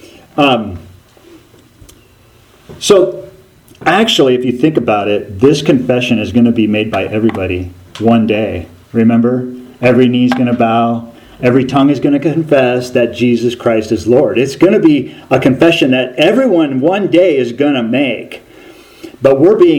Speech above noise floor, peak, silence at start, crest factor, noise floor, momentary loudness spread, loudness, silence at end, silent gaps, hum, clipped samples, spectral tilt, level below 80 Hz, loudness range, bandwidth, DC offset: 34 dB; 0 dBFS; 0.35 s; 12 dB; -45 dBFS; 9 LU; -11 LUFS; 0 s; none; none; 0.2%; -6 dB/octave; -46 dBFS; 3 LU; 15 kHz; under 0.1%